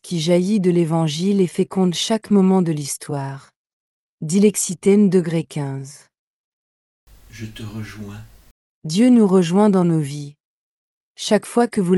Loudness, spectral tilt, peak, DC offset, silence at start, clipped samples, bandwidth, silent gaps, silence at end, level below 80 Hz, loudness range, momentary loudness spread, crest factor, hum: -18 LUFS; -6 dB/octave; -4 dBFS; under 0.1%; 0.05 s; under 0.1%; 12.5 kHz; 3.56-3.65 s, 3.73-4.18 s, 6.19-7.07 s, 8.51-8.82 s, 10.40-11.15 s; 0 s; -58 dBFS; 9 LU; 19 LU; 16 dB; none